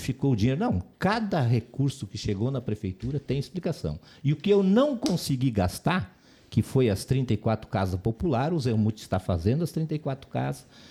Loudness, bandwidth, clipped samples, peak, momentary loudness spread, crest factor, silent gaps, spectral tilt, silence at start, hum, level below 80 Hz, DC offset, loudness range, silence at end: -27 LUFS; 15 kHz; under 0.1%; -10 dBFS; 8 LU; 16 dB; none; -7 dB/octave; 0 s; none; -48 dBFS; under 0.1%; 3 LU; 0.05 s